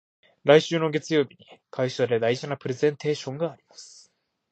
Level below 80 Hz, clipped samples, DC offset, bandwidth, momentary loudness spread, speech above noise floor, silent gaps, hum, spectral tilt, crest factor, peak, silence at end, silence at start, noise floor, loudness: -74 dBFS; under 0.1%; under 0.1%; 8.4 kHz; 16 LU; 39 dB; none; none; -5.5 dB/octave; 24 dB; -2 dBFS; 0.65 s; 0.45 s; -63 dBFS; -25 LUFS